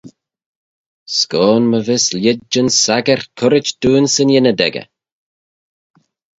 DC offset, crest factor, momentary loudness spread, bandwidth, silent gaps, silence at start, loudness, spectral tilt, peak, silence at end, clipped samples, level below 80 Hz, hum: under 0.1%; 16 dB; 5 LU; 8 kHz; 0.46-1.06 s; 0.05 s; -13 LUFS; -3.5 dB/octave; 0 dBFS; 1.55 s; under 0.1%; -52 dBFS; none